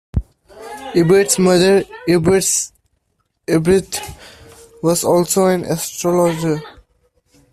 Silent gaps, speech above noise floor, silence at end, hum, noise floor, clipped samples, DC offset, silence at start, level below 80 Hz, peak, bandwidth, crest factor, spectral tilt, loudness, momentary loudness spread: none; 53 dB; 0.85 s; none; -67 dBFS; under 0.1%; under 0.1%; 0.15 s; -38 dBFS; 0 dBFS; 15 kHz; 16 dB; -4.5 dB/octave; -16 LUFS; 13 LU